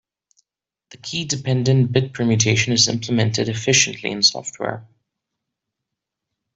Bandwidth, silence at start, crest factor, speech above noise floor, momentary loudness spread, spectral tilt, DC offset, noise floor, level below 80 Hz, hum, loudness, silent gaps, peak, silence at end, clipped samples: 8.2 kHz; 0.95 s; 20 dB; 67 dB; 12 LU; -3.5 dB/octave; under 0.1%; -86 dBFS; -56 dBFS; none; -18 LUFS; none; -2 dBFS; 1.7 s; under 0.1%